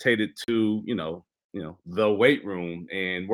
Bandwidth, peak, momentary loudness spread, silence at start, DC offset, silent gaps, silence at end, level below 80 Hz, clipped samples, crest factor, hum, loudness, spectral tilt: 16 kHz; -6 dBFS; 17 LU; 0 s; under 0.1%; 1.44-1.50 s; 0 s; -68 dBFS; under 0.1%; 20 dB; none; -26 LUFS; -6 dB/octave